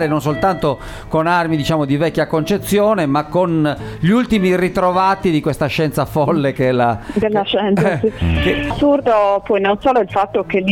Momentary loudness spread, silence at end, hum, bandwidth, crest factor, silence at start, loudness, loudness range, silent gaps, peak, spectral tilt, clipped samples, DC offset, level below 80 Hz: 4 LU; 0 s; none; 17 kHz; 14 dB; 0 s; -16 LUFS; 1 LU; none; -2 dBFS; -6.5 dB/octave; under 0.1%; under 0.1%; -34 dBFS